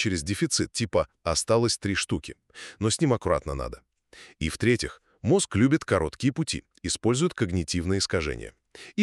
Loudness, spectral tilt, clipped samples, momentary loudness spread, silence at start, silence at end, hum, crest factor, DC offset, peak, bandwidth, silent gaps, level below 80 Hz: -26 LUFS; -4.5 dB/octave; under 0.1%; 12 LU; 0 s; 0 s; none; 20 dB; under 0.1%; -8 dBFS; 13 kHz; none; -44 dBFS